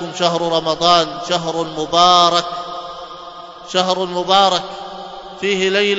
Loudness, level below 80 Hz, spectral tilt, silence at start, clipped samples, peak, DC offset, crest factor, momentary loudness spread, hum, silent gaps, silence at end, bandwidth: -15 LUFS; -52 dBFS; -3 dB/octave; 0 s; under 0.1%; 0 dBFS; under 0.1%; 18 dB; 20 LU; none; none; 0 s; 8 kHz